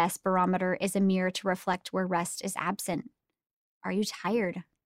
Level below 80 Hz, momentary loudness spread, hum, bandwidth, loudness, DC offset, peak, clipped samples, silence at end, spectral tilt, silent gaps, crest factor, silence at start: -70 dBFS; 7 LU; none; 16 kHz; -30 LUFS; under 0.1%; -14 dBFS; under 0.1%; 0.25 s; -5 dB/octave; 3.51-3.81 s; 18 dB; 0 s